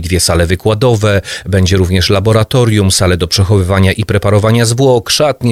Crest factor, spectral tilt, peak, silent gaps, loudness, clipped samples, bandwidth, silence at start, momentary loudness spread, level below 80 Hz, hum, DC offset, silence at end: 10 dB; -5 dB/octave; 0 dBFS; none; -10 LUFS; under 0.1%; 15 kHz; 0 s; 3 LU; -30 dBFS; none; under 0.1%; 0 s